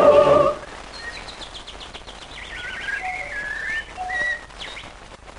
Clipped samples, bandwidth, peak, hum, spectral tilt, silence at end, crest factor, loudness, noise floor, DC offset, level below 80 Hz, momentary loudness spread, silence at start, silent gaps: under 0.1%; 10.5 kHz; -2 dBFS; none; -4.5 dB/octave; 0 s; 20 dB; -23 LUFS; -41 dBFS; under 0.1%; -46 dBFS; 19 LU; 0 s; none